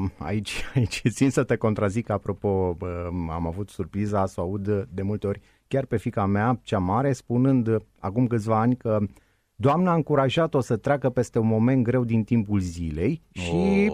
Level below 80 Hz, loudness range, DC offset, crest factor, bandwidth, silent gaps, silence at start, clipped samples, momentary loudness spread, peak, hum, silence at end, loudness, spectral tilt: -46 dBFS; 5 LU; under 0.1%; 16 dB; 13.5 kHz; none; 0 s; under 0.1%; 8 LU; -8 dBFS; none; 0 s; -25 LUFS; -7.5 dB/octave